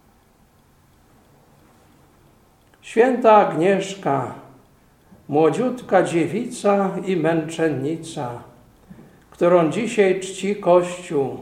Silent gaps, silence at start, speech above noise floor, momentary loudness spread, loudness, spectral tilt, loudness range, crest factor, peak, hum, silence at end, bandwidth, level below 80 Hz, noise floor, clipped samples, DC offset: none; 2.85 s; 37 dB; 11 LU; -20 LUFS; -6 dB/octave; 4 LU; 20 dB; -2 dBFS; none; 0 s; 14.5 kHz; -60 dBFS; -56 dBFS; under 0.1%; under 0.1%